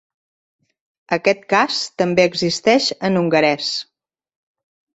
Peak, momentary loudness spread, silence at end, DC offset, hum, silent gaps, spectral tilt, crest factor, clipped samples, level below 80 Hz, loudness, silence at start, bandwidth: -2 dBFS; 6 LU; 1.1 s; under 0.1%; none; none; -4 dB/octave; 18 dB; under 0.1%; -62 dBFS; -17 LUFS; 1.1 s; 8.2 kHz